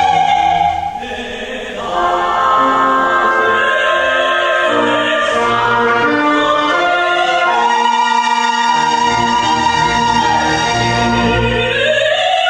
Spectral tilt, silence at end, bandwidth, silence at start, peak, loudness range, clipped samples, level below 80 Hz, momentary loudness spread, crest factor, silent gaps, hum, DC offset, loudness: -3.5 dB/octave; 0 s; 10 kHz; 0 s; -2 dBFS; 1 LU; under 0.1%; -38 dBFS; 3 LU; 12 dB; none; none; under 0.1%; -13 LUFS